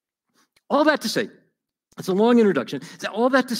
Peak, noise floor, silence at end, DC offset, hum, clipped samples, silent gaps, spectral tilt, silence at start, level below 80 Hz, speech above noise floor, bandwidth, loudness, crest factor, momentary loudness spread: -4 dBFS; -70 dBFS; 0 s; under 0.1%; none; under 0.1%; none; -5 dB/octave; 0.7 s; -74 dBFS; 50 dB; 16 kHz; -21 LUFS; 18 dB; 15 LU